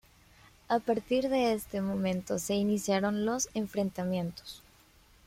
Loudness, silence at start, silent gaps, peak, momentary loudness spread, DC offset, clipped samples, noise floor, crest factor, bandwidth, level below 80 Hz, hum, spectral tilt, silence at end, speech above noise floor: -31 LUFS; 0.7 s; none; -14 dBFS; 6 LU; under 0.1%; under 0.1%; -61 dBFS; 18 dB; 16.5 kHz; -60 dBFS; none; -5 dB/octave; 0.7 s; 30 dB